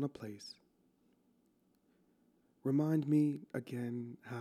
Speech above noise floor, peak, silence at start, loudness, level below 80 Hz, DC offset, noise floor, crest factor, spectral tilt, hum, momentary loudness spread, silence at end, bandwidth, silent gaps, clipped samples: 38 dB; -22 dBFS; 0 s; -36 LUFS; -84 dBFS; under 0.1%; -74 dBFS; 18 dB; -8 dB/octave; none; 16 LU; 0 s; 14 kHz; none; under 0.1%